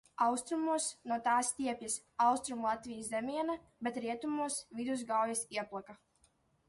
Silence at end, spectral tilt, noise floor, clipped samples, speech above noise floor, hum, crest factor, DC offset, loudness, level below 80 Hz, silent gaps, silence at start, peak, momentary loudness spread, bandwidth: 0.75 s; -2.5 dB/octave; -73 dBFS; under 0.1%; 37 dB; none; 18 dB; under 0.1%; -36 LUFS; -74 dBFS; none; 0.2 s; -18 dBFS; 8 LU; 12 kHz